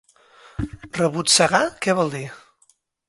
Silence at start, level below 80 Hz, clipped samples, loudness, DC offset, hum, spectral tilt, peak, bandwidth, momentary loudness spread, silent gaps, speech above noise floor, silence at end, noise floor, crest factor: 0.6 s; -48 dBFS; under 0.1%; -19 LUFS; under 0.1%; none; -3 dB/octave; -2 dBFS; 12 kHz; 18 LU; none; 42 dB; 0.7 s; -62 dBFS; 22 dB